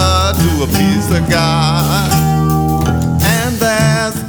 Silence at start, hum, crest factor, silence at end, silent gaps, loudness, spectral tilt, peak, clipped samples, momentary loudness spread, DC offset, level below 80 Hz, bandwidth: 0 s; none; 12 dB; 0 s; none; -13 LUFS; -5 dB/octave; 0 dBFS; under 0.1%; 2 LU; under 0.1%; -24 dBFS; over 20 kHz